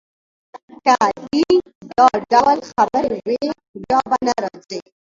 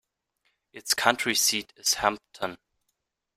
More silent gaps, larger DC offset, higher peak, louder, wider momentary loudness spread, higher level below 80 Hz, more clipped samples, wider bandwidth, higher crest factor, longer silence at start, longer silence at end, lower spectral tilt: first, 0.63-0.68 s, 1.75-1.81 s, 3.68-3.74 s vs none; neither; first, 0 dBFS vs -4 dBFS; first, -17 LUFS vs -25 LUFS; about the same, 12 LU vs 13 LU; first, -54 dBFS vs -64 dBFS; neither; second, 7.8 kHz vs 16 kHz; second, 18 dB vs 26 dB; second, 0.55 s vs 0.75 s; second, 0.3 s vs 0.8 s; first, -4 dB/octave vs -0.5 dB/octave